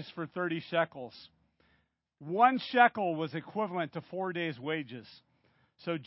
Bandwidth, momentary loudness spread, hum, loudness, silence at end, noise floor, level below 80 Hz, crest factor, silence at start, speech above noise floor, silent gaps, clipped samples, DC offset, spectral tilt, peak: 5.6 kHz; 19 LU; none; -31 LUFS; 0 s; -74 dBFS; -78 dBFS; 24 dB; 0 s; 42 dB; none; under 0.1%; under 0.1%; -3.5 dB/octave; -8 dBFS